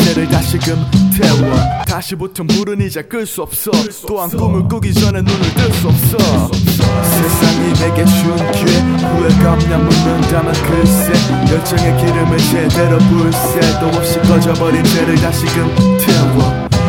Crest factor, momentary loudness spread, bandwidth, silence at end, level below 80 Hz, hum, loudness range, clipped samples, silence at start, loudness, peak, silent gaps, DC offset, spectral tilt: 12 dB; 6 LU; over 20 kHz; 0 s; -26 dBFS; none; 4 LU; 0.1%; 0 s; -12 LUFS; 0 dBFS; none; under 0.1%; -5.5 dB/octave